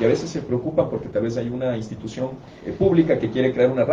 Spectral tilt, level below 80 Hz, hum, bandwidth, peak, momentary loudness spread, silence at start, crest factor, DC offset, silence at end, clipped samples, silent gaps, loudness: -7.5 dB/octave; -48 dBFS; none; 7.8 kHz; -4 dBFS; 12 LU; 0 s; 16 dB; under 0.1%; 0 s; under 0.1%; none; -22 LUFS